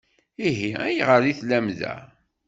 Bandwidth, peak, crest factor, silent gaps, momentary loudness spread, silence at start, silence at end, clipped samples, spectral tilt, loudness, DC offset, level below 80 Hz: 8 kHz; -4 dBFS; 20 dB; none; 13 LU; 0.4 s; 0.4 s; under 0.1%; -6 dB/octave; -23 LUFS; under 0.1%; -62 dBFS